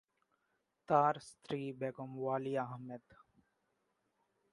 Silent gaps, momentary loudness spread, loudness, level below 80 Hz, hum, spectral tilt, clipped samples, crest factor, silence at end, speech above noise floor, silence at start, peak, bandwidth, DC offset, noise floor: none; 16 LU; -37 LUFS; -82 dBFS; none; -7 dB/octave; under 0.1%; 24 dB; 1.55 s; 45 dB; 0.9 s; -16 dBFS; 11.5 kHz; under 0.1%; -83 dBFS